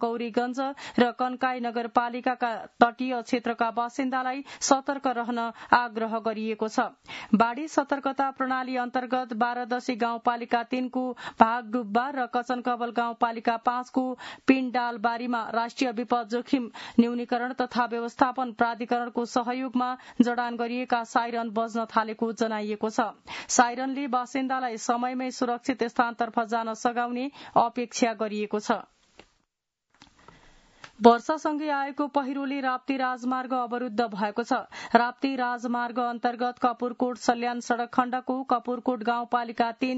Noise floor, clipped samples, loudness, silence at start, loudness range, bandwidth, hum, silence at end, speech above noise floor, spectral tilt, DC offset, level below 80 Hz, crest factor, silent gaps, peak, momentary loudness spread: -81 dBFS; under 0.1%; -27 LUFS; 0 s; 1 LU; 8 kHz; none; 0 s; 54 dB; -4 dB/octave; under 0.1%; -70 dBFS; 26 dB; none; 0 dBFS; 6 LU